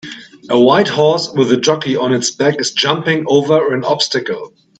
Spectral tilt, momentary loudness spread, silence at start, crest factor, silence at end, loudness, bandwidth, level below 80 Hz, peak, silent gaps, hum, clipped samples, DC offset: -4 dB/octave; 8 LU; 0.05 s; 14 dB; 0.35 s; -14 LUFS; 9.2 kHz; -60 dBFS; 0 dBFS; none; none; under 0.1%; under 0.1%